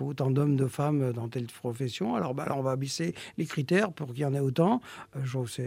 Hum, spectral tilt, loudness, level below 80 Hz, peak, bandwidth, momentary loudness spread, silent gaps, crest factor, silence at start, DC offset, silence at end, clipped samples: none; -6.5 dB/octave; -30 LUFS; -70 dBFS; -12 dBFS; 15.5 kHz; 9 LU; none; 18 dB; 0 s; under 0.1%; 0 s; under 0.1%